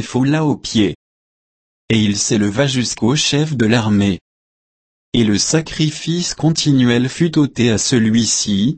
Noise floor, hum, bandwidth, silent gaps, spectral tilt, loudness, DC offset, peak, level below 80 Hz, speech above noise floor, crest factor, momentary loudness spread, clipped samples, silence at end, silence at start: under -90 dBFS; none; 8.8 kHz; 0.95-1.88 s, 4.21-5.12 s; -4.5 dB/octave; -15 LUFS; under 0.1%; -2 dBFS; -46 dBFS; over 75 dB; 14 dB; 6 LU; under 0.1%; 0 s; 0 s